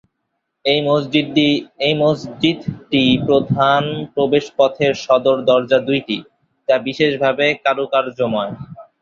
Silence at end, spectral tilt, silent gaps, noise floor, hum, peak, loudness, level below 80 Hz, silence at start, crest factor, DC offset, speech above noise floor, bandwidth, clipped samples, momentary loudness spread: 0.2 s; -6 dB/octave; none; -74 dBFS; none; -2 dBFS; -17 LUFS; -54 dBFS; 0.65 s; 16 dB; under 0.1%; 57 dB; 7.4 kHz; under 0.1%; 8 LU